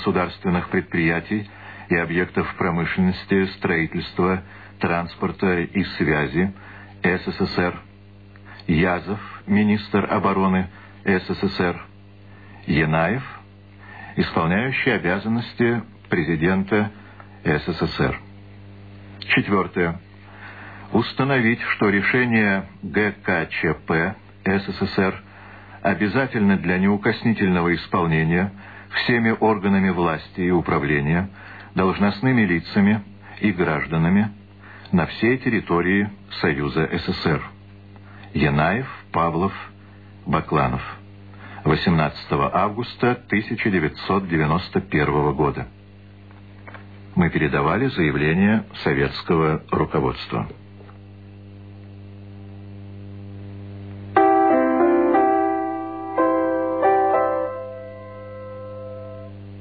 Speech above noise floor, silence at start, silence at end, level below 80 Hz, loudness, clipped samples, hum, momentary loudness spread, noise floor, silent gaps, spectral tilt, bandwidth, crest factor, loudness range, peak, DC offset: 25 dB; 0 s; 0 s; -46 dBFS; -21 LUFS; under 0.1%; 50 Hz at -45 dBFS; 19 LU; -45 dBFS; none; -9.5 dB/octave; 4.9 kHz; 18 dB; 4 LU; -4 dBFS; 0.2%